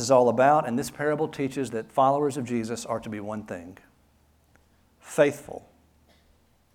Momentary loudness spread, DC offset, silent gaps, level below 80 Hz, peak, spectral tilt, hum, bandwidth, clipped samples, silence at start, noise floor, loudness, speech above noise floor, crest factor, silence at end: 19 LU; under 0.1%; none; -64 dBFS; -6 dBFS; -5.5 dB/octave; none; 17 kHz; under 0.1%; 0 s; -63 dBFS; -25 LUFS; 38 dB; 20 dB; 1.15 s